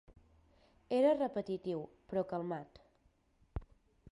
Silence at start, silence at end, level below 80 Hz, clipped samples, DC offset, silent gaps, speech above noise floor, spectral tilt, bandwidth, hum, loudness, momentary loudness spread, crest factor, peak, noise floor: 0.9 s; 0.5 s; -60 dBFS; under 0.1%; under 0.1%; none; 37 dB; -8 dB/octave; 11 kHz; none; -36 LUFS; 18 LU; 20 dB; -20 dBFS; -73 dBFS